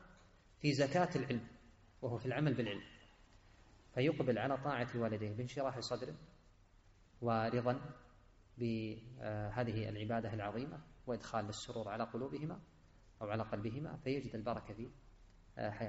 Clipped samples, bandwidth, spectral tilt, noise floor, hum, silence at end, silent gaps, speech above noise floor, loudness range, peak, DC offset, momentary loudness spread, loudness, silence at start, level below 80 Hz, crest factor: under 0.1%; 7.6 kHz; -5.5 dB/octave; -66 dBFS; none; 0 s; none; 27 dB; 5 LU; -20 dBFS; under 0.1%; 13 LU; -41 LUFS; 0 s; -64 dBFS; 20 dB